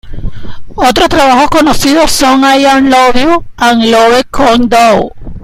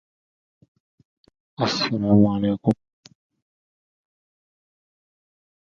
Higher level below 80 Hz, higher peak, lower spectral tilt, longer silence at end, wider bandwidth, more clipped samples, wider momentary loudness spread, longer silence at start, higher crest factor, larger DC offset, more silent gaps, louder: first, -26 dBFS vs -54 dBFS; first, 0 dBFS vs -4 dBFS; second, -3.5 dB/octave vs -6.5 dB/octave; second, 0 s vs 3.05 s; first, 16.5 kHz vs 7.4 kHz; first, 0.3% vs under 0.1%; about the same, 7 LU vs 8 LU; second, 0.05 s vs 1.6 s; second, 6 dB vs 22 dB; neither; neither; first, -7 LUFS vs -21 LUFS